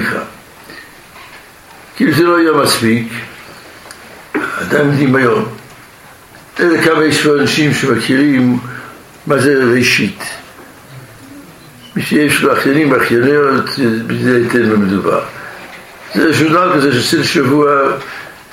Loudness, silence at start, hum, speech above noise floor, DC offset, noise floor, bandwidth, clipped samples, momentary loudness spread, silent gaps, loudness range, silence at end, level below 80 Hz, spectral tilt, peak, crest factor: -12 LUFS; 0 s; none; 27 dB; under 0.1%; -38 dBFS; 16.5 kHz; under 0.1%; 21 LU; none; 4 LU; 0.15 s; -50 dBFS; -5 dB/octave; 0 dBFS; 14 dB